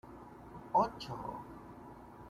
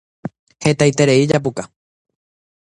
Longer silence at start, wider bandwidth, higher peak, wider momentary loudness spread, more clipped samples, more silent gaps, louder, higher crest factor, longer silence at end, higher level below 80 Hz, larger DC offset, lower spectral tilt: second, 0.05 s vs 0.25 s; first, 14.5 kHz vs 10.5 kHz; second, -18 dBFS vs 0 dBFS; about the same, 20 LU vs 20 LU; neither; second, none vs 0.39-0.47 s; second, -36 LUFS vs -15 LUFS; about the same, 22 dB vs 18 dB; second, 0 s vs 0.95 s; second, -62 dBFS vs -54 dBFS; neither; about the same, -6.5 dB/octave vs -5.5 dB/octave